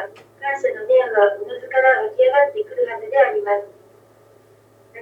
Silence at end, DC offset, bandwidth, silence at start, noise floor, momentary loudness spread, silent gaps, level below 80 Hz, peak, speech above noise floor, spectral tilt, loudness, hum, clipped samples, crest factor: 0 s; under 0.1%; 7.6 kHz; 0 s; -52 dBFS; 9 LU; none; -74 dBFS; -2 dBFS; 34 dB; -4 dB/octave; -18 LUFS; none; under 0.1%; 18 dB